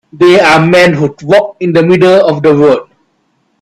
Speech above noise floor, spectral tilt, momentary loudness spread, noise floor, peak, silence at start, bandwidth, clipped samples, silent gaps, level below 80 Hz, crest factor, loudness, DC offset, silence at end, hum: 51 dB; -6 dB/octave; 5 LU; -57 dBFS; 0 dBFS; 0.15 s; 12.5 kHz; 0.3%; none; -46 dBFS; 8 dB; -7 LUFS; under 0.1%; 0.8 s; none